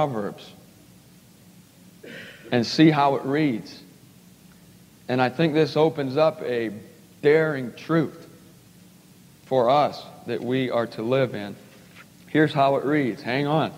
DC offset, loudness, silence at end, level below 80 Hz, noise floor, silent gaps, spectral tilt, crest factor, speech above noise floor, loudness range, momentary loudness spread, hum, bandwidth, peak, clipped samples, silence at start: under 0.1%; -23 LUFS; 0 s; -70 dBFS; -51 dBFS; none; -7 dB/octave; 20 dB; 29 dB; 3 LU; 18 LU; none; 16 kHz; -4 dBFS; under 0.1%; 0 s